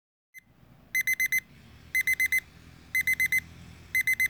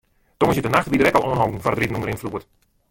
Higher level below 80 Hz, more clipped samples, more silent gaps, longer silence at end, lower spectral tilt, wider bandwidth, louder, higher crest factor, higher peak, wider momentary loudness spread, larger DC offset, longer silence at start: second, -60 dBFS vs -46 dBFS; neither; neither; second, 0 s vs 0.5 s; second, 0 dB/octave vs -6 dB/octave; first, over 20 kHz vs 17 kHz; second, -26 LUFS vs -20 LUFS; about the same, 16 dB vs 18 dB; second, -14 dBFS vs -2 dBFS; second, 6 LU vs 11 LU; neither; about the same, 0.35 s vs 0.4 s